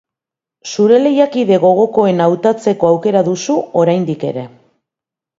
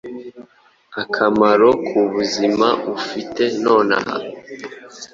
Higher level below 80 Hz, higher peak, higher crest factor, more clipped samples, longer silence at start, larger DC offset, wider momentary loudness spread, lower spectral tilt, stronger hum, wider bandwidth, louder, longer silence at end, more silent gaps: about the same, -60 dBFS vs -58 dBFS; about the same, 0 dBFS vs -2 dBFS; about the same, 14 dB vs 16 dB; neither; first, 0.65 s vs 0.05 s; neither; second, 11 LU vs 20 LU; first, -6.5 dB/octave vs -4.5 dB/octave; neither; about the same, 7.8 kHz vs 7.8 kHz; first, -13 LUFS vs -17 LUFS; first, 0.9 s vs 0.05 s; neither